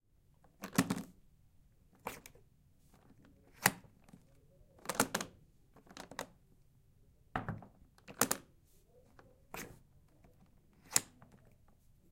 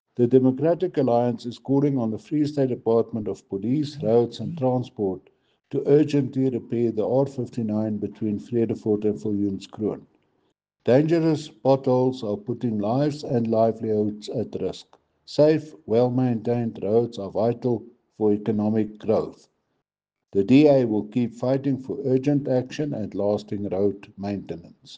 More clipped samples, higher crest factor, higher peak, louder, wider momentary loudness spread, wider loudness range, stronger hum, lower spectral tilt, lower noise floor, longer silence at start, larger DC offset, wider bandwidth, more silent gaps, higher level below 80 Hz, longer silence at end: neither; first, 36 dB vs 18 dB; about the same, -6 dBFS vs -6 dBFS; second, -38 LUFS vs -24 LUFS; first, 22 LU vs 10 LU; about the same, 4 LU vs 3 LU; neither; second, -2.5 dB/octave vs -8.5 dB/octave; second, -68 dBFS vs -85 dBFS; first, 0.6 s vs 0.2 s; neither; first, 16.5 kHz vs 8.8 kHz; neither; about the same, -66 dBFS vs -64 dBFS; first, 1.05 s vs 0 s